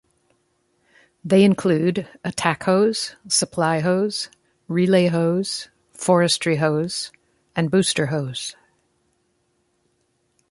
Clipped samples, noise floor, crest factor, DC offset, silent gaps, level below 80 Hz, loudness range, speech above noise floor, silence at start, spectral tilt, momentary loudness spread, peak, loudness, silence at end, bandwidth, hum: under 0.1%; -68 dBFS; 20 dB; under 0.1%; none; -62 dBFS; 5 LU; 48 dB; 1.25 s; -5 dB/octave; 13 LU; -2 dBFS; -20 LUFS; 2 s; 11.5 kHz; none